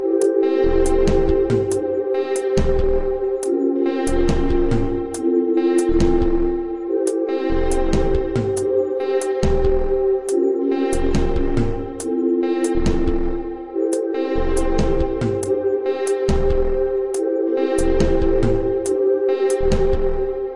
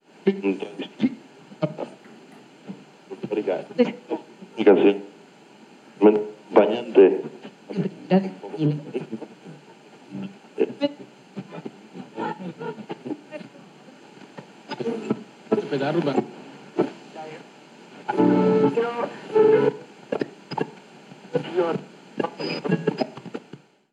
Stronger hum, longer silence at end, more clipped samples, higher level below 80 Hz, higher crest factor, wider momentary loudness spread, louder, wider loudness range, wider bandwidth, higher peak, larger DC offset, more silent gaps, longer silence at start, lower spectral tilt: neither; second, 0 s vs 0.55 s; neither; first, -24 dBFS vs -86 dBFS; second, 14 dB vs 22 dB; second, 4 LU vs 23 LU; first, -20 LUFS vs -24 LUFS; second, 2 LU vs 12 LU; first, 11.5 kHz vs 8.8 kHz; about the same, -4 dBFS vs -2 dBFS; neither; neither; second, 0 s vs 0.25 s; about the same, -6.5 dB/octave vs -7.5 dB/octave